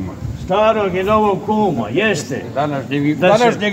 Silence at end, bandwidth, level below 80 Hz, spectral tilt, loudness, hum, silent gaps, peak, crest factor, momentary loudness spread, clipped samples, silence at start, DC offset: 0 s; 16 kHz; -40 dBFS; -5.5 dB/octave; -16 LUFS; none; none; 0 dBFS; 16 dB; 8 LU; under 0.1%; 0 s; under 0.1%